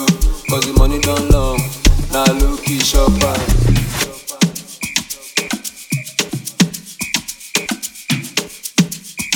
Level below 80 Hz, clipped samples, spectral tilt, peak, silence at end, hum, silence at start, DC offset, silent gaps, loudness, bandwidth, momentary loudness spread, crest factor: -20 dBFS; under 0.1%; -4 dB/octave; 0 dBFS; 0 s; none; 0 s; under 0.1%; none; -17 LUFS; 19 kHz; 9 LU; 14 dB